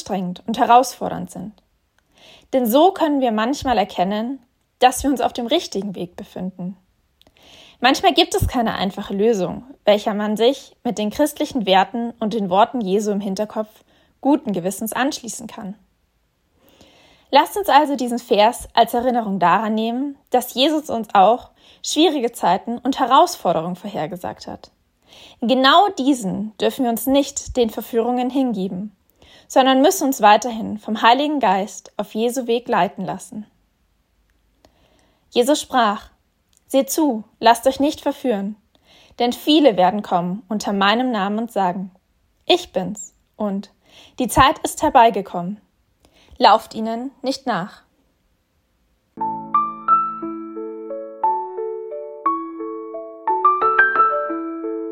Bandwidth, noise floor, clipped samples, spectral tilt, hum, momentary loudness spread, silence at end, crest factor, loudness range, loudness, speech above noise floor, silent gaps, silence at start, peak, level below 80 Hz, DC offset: 16.5 kHz; -65 dBFS; under 0.1%; -4 dB/octave; none; 15 LU; 0 s; 20 dB; 6 LU; -19 LUFS; 47 dB; none; 0 s; 0 dBFS; -48 dBFS; under 0.1%